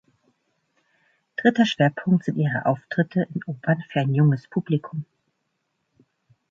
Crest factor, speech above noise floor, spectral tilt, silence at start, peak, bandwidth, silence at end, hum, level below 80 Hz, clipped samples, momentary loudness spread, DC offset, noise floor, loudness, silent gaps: 20 dB; 53 dB; -7.5 dB/octave; 1.4 s; -6 dBFS; 7.4 kHz; 1.45 s; none; -68 dBFS; under 0.1%; 10 LU; under 0.1%; -75 dBFS; -23 LUFS; none